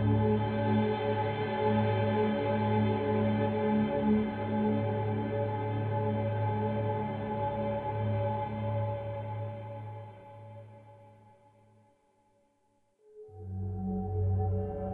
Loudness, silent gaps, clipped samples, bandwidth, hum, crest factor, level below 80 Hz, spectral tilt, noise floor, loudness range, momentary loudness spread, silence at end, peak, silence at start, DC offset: -31 LUFS; none; under 0.1%; 4.3 kHz; none; 14 dB; -52 dBFS; -10.5 dB/octave; -72 dBFS; 15 LU; 14 LU; 0 s; -16 dBFS; 0 s; under 0.1%